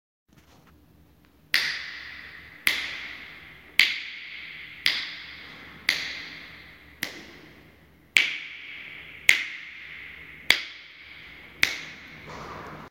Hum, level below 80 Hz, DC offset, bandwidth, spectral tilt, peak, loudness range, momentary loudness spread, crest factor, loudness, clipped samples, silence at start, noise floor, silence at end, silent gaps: none; -62 dBFS; under 0.1%; 16 kHz; 0 dB/octave; 0 dBFS; 5 LU; 21 LU; 32 dB; -26 LUFS; under 0.1%; 0.65 s; -58 dBFS; 0 s; none